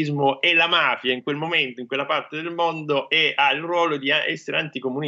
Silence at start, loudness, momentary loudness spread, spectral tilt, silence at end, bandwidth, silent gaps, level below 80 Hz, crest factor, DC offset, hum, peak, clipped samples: 0 s; -21 LUFS; 8 LU; -5 dB/octave; 0 s; 7.8 kHz; none; -76 dBFS; 16 dB; under 0.1%; none; -6 dBFS; under 0.1%